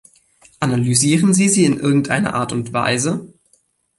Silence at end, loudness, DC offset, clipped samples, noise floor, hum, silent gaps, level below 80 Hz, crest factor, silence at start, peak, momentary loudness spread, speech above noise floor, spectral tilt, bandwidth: 0.7 s; -16 LUFS; under 0.1%; under 0.1%; -61 dBFS; none; none; -54 dBFS; 18 dB; 0.6 s; 0 dBFS; 8 LU; 44 dB; -4.5 dB/octave; 12 kHz